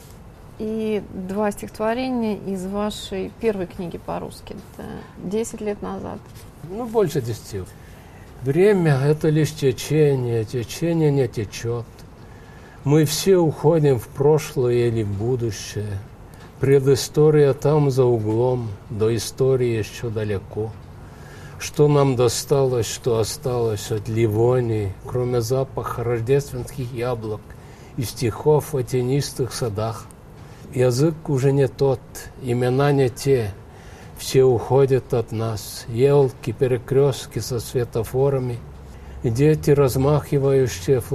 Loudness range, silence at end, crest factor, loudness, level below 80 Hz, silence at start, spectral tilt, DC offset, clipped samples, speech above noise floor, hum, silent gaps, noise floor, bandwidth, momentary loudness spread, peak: 7 LU; 0 s; 18 dB; -21 LUFS; -44 dBFS; 0 s; -6.5 dB/octave; under 0.1%; under 0.1%; 22 dB; none; none; -42 dBFS; 14.5 kHz; 15 LU; -4 dBFS